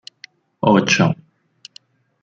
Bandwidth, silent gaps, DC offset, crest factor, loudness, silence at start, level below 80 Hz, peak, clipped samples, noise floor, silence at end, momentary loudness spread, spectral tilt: 7.6 kHz; none; under 0.1%; 18 dB; -16 LUFS; 0.65 s; -56 dBFS; -2 dBFS; under 0.1%; -50 dBFS; 1.1 s; 17 LU; -5 dB/octave